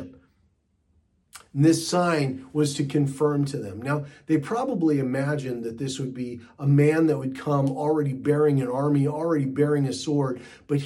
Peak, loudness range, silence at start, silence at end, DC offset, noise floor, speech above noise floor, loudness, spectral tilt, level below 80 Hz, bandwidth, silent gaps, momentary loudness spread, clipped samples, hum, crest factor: -8 dBFS; 3 LU; 0 s; 0 s; under 0.1%; -67 dBFS; 44 dB; -24 LUFS; -7 dB/octave; -66 dBFS; 12.5 kHz; none; 10 LU; under 0.1%; none; 16 dB